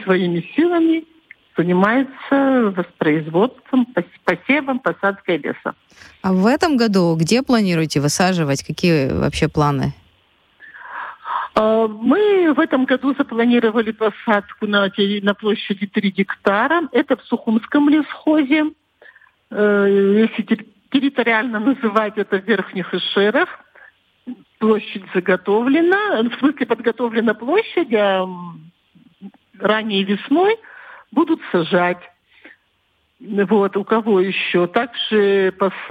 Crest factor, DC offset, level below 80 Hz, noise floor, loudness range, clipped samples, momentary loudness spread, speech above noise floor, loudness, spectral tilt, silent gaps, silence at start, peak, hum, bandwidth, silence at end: 14 dB; under 0.1%; -50 dBFS; -64 dBFS; 3 LU; under 0.1%; 8 LU; 47 dB; -18 LUFS; -5.5 dB/octave; none; 0 s; -4 dBFS; none; 14 kHz; 0 s